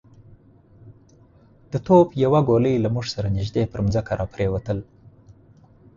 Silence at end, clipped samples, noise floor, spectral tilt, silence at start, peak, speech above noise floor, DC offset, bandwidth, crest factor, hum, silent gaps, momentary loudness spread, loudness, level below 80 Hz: 0.65 s; under 0.1%; -52 dBFS; -8 dB/octave; 0.85 s; -4 dBFS; 32 dB; under 0.1%; 7.6 kHz; 20 dB; none; none; 13 LU; -21 LUFS; -42 dBFS